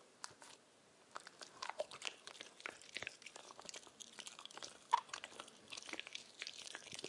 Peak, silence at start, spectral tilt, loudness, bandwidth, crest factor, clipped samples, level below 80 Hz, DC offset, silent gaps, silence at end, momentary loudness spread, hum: -18 dBFS; 0 s; -0.5 dB/octave; -48 LUFS; 11.5 kHz; 32 dB; under 0.1%; under -90 dBFS; under 0.1%; none; 0 s; 14 LU; none